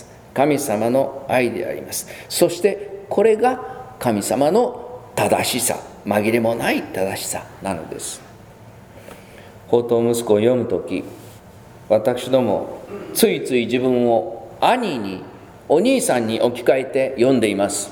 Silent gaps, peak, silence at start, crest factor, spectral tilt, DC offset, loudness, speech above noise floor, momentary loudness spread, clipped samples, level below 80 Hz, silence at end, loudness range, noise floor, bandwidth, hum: none; 0 dBFS; 0 s; 20 dB; -4.5 dB/octave; under 0.1%; -19 LUFS; 24 dB; 12 LU; under 0.1%; -56 dBFS; 0 s; 4 LU; -42 dBFS; over 20 kHz; none